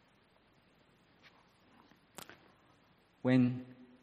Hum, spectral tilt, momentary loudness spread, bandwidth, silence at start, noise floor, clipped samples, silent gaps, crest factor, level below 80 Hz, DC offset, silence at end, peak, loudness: none; -7.5 dB/octave; 25 LU; 15 kHz; 3.25 s; -69 dBFS; under 0.1%; none; 22 dB; -78 dBFS; under 0.1%; 0.4 s; -16 dBFS; -33 LUFS